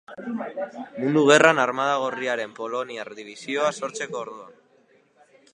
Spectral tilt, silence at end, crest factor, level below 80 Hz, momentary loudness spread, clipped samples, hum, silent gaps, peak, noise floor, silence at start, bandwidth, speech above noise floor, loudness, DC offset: -4 dB/octave; 1 s; 24 dB; -74 dBFS; 19 LU; under 0.1%; none; none; 0 dBFS; -60 dBFS; 0.1 s; 11 kHz; 36 dB; -23 LUFS; under 0.1%